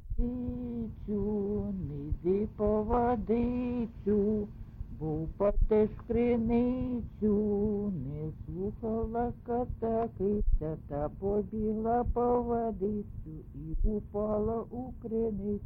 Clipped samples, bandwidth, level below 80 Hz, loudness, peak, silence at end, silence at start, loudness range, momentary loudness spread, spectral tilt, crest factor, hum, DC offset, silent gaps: under 0.1%; 4.2 kHz; -38 dBFS; -32 LUFS; -16 dBFS; 0 s; 0 s; 3 LU; 10 LU; -12 dB/octave; 16 dB; none; under 0.1%; none